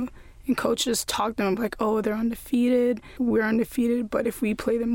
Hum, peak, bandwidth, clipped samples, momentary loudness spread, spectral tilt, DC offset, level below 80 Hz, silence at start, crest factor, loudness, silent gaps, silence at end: none; -10 dBFS; 17 kHz; under 0.1%; 5 LU; -4.5 dB/octave; under 0.1%; -50 dBFS; 0 s; 14 dB; -25 LUFS; none; 0 s